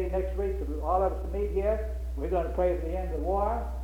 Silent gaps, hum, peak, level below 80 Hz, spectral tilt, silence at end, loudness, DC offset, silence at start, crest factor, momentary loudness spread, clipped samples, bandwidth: none; none; -14 dBFS; -34 dBFS; -9 dB/octave; 0 s; -30 LUFS; under 0.1%; 0 s; 14 dB; 5 LU; under 0.1%; 7 kHz